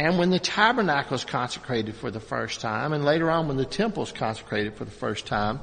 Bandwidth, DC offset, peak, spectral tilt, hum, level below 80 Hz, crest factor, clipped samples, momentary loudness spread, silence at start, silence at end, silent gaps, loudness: 9.4 kHz; under 0.1%; -4 dBFS; -5 dB/octave; none; -50 dBFS; 22 dB; under 0.1%; 10 LU; 0 s; 0 s; none; -26 LUFS